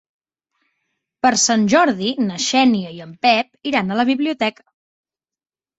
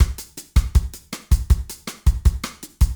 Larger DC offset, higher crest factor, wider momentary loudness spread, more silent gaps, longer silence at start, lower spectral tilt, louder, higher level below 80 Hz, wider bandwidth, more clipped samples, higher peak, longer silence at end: neither; about the same, 18 dB vs 16 dB; second, 8 LU vs 13 LU; neither; first, 1.25 s vs 0 s; second, -3 dB/octave vs -5 dB/octave; first, -17 LUFS vs -22 LUFS; second, -62 dBFS vs -20 dBFS; second, 8.2 kHz vs over 20 kHz; neither; about the same, -2 dBFS vs -4 dBFS; first, 1.3 s vs 0 s